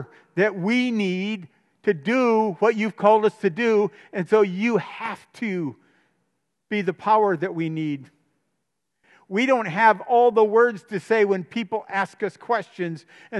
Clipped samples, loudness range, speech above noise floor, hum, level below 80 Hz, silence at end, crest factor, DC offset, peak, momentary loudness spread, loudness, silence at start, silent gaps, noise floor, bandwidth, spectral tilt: under 0.1%; 5 LU; 57 dB; none; -80 dBFS; 0 s; 20 dB; under 0.1%; -4 dBFS; 13 LU; -22 LUFS; 0 s; none; -79 dBFS; 10.5 kHz; -6.5 dB/octave